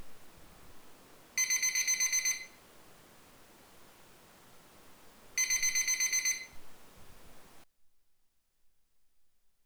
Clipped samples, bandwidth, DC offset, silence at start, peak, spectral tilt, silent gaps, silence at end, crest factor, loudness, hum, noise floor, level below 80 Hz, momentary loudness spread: under 0.1%; over 20 kHz; under 0.1%; 0 s; -18 dBFS; 2.5 dB/octave; none; 1.8 s; 20 dB; -29 LUFS; none; -71 dBFS; -66 dBFS; 10 LU